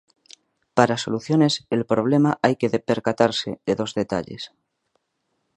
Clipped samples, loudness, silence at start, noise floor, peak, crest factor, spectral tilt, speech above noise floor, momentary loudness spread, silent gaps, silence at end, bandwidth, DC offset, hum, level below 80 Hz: under 0.1%; -22 LUFS; 0.75 s; -74 dBFS; 0 dBFS; 22 dB; -5.5 dB/octave; 53 dB; 7 LU; none; 1.1 s; 11 kHz; under 0.1%; none; -60 dBFS